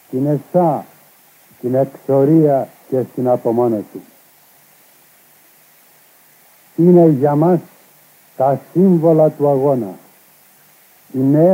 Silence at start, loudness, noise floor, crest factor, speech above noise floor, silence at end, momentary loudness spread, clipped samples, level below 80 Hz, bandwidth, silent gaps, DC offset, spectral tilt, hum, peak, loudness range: 0.1 s; -15 LUFS; -49 dBFS; 16 dB; 36 dB; 0 s; 12 LU; under 0.1%; -70 dBFS; 16 kHz; none; under 0.1%; -10 dB/octave; none; 0 dBFS; 8 LU